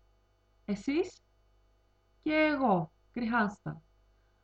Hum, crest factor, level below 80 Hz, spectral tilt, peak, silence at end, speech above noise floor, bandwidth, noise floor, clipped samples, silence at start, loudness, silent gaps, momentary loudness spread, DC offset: 50 Hz at -60 dBFS; 18 dB; -64 dBFS; -6.5 dB/octave; -16 dBFS; 0.65 s; 38 dB; 8.2 kHz; -69 dBFS; under 0.1%; 0.7 s; -31 LUFS; none; 17 LU; under 0.1%